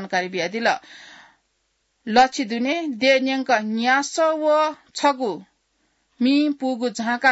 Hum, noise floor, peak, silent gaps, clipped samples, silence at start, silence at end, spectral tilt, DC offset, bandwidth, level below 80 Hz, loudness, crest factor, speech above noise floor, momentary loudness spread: none; -70 dBFS; -4 dBFS; none; under 0.1%; 0 s; 0 s; -3.5 dB/octave; under 0.1%; 8 kHz; -66 dBFS; -21 LUFS; 18 dB; 50 dB; 7 LU